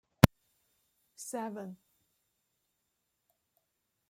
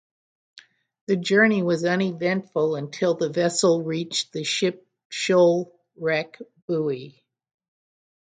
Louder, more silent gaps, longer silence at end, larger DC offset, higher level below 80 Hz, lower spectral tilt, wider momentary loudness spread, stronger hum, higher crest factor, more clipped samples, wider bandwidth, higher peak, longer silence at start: second, -31 LUFS vs -23 LUFS; second, none vs 5.05-5.10 s, 6.62-6.68 s; first, 2.35 s vs 1.15 s; neither; first, -52 dBFS vs -72 dBFS; first, -6 dB/octave vs -4.5 dB/octave; first, 20 LU vs 12 LU; neither; first, 34 dB vs 20 dB; neither; first, 16.5 kHz vs 9.4 kHz; about the same, -2 dBFS vs -4 dBFS; second, 0.25 s vs 1.1 s